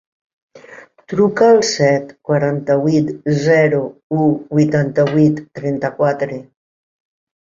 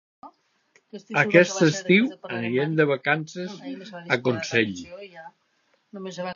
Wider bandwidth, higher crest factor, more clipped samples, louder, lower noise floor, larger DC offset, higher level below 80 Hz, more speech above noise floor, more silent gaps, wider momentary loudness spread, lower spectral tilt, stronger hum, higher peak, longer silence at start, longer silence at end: about the same, 7.6 kHz vs 7.4 kHz; second, 14 dB vs 24 dB; neither; first, -16 LUFS vs -23 LUFS; second, -41 dBFS vs -68 dBFS; neither; first, -58 dBFS vs -68 dBFS; second, 26 dB vs 44 dB; first, 4.03-4.10 s vs none; second, 10 LU vs 22 LU; first, -6.5 dB/octave vs -5 dB/octave; neither; about the same, -2 dBFS vs -2 dBFS; first, 0.55 s vs 0.25 s; first, 1.05 s vs 0 s